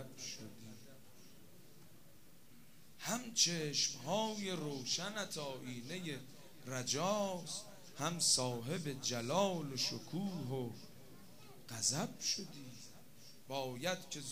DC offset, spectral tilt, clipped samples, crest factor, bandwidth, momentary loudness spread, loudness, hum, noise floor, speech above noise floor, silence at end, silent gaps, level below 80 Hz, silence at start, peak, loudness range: 0.2%; -3 dB/octave; under 0.1%; 24 dB; 15.5 kHz; 23 LU; -38 LUFS; none; -64 dBFS; 25 dB; 0 s; none; -78 dBFS; 0 s; -18 dBFS; 5 LU